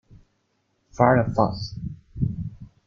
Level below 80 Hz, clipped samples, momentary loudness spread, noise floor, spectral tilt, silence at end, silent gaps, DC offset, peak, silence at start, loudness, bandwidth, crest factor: -46 dBFS; under 0.1%; 18 LU; -71 dBFS; -8 dB/octave; 0.2 s; none; under 0.1%; -2 dBFS; 0.95 s; -23 LUFS; 7 kHz; 22 dB